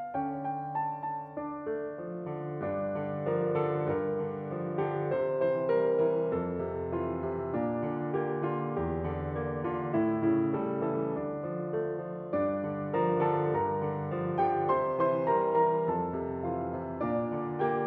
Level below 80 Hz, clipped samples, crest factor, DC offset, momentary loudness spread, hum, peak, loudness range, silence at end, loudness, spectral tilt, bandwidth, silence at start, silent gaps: -62 dBFS; under 0.1%; 16 dB; under 0.1%; 8 LU; none; -16 dBFS; 4 LU; 0 s; -31 LUFS; -11.5 dB/octave; 4.6 kHz; 0 s; none